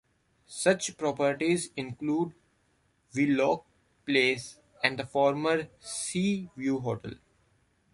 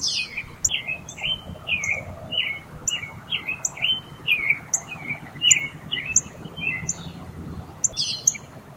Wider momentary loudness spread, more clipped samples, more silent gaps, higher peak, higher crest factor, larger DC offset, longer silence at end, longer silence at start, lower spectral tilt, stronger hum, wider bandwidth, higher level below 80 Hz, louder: about the same, 12 LU vs 11 LU; neither; neither; second, -6 dBFS vs -2 dBFS; about the same, 24 dB vs 26 dB; neither; first, 0.8 s vs 0 s; first, 0.5 s vs 0 s; first, -4.5 dB/octave vs 0 dB/octave; neither; second, 11.5 kHz vs 16.5 kHz; second, -66 dBFS vs -52 dBFS; second, -29 LUFS vs -23 LUFS